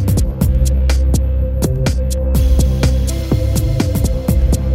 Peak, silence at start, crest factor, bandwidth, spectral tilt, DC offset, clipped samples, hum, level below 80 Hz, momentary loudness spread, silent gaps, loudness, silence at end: -2 dBFS; 0 s; 12 dB; 16 kHz; -6.5 dB/octave; under 0.1%; under 0.1%; none; -16 dBFS; 3 LU; none; -16 LUFS; 0 s